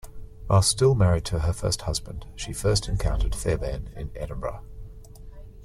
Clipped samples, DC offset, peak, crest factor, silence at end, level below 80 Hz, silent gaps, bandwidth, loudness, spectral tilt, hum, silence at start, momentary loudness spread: under 0.1%; under 0.1%; -8 dBFS; 18 dB; 0 s; -34 dBFS; none; 14.5 kHz; -25 LUFS; -5 dB/octave; none; 0.05 s; 21 LU